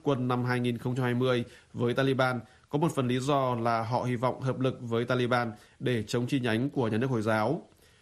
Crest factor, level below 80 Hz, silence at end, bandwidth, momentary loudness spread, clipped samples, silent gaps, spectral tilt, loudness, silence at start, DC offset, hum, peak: 16 dB; -64 dBFS; 0.4 s; 13 kHz; 5 LU; under 0.1%; none; -6.5 dB/octave; -29 LUFS; 0.05 s; under 0.1%; none; -12 dBFS